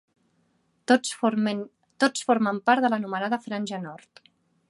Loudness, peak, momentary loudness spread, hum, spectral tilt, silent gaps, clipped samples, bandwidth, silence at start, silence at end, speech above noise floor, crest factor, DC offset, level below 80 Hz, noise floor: -25 LUFS; -6 dBFS; 13 LU; none; -4 dB/octave; none; under 0.1%; 11.5 kHz; 0.9 s; 0.75 s; 44 dB; 20 dB; under 0.1%; -78 dBFS; -69 dBFS